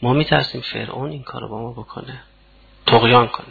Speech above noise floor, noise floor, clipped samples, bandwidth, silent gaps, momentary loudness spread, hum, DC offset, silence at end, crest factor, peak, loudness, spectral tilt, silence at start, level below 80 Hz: 31 dB; -50 dBFS; under 0.1%; 4.9 kHz; none; 21 LU; none; under 0.1%; 0 s; 18 dB; 0 dBFS; -17 LUFS; -8 dB/octave; 0 s; -46 dBFS